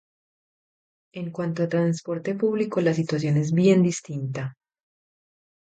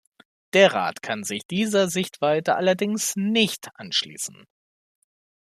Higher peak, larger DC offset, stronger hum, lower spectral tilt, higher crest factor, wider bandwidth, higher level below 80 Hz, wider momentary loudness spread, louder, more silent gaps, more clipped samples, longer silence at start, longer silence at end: about the same, -6 dBFS vs -4 dBFS; neither; neither; first, -7 dB/octave vs -3.5 dB/octave; about the same, 18 dB vs 20 dB; second, 9 kHz vs 15 kHz; about the same, -66 dBFS vs -70 dBFS; about the same, 14 LU vs 12 LU; about the same, -24 LUFS vs -23 LUFS; second, none vs 1.45-1.49 s; neither; first, 1.15 s vs 0.55 s; about the same, 1.1 s vs 1.15 s